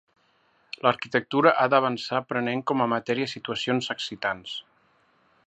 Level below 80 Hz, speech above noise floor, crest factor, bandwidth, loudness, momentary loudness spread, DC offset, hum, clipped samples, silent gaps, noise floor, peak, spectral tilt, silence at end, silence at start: -70 dBFS; 40 dB; 24 dB; 8.6 kHz; -25 LUFS; 10 LU; under 0.1%; none; under 0.1%; none; -65 dBFS; -4 dBFS; -5 dB/octave; 0.85 s; 0.85 s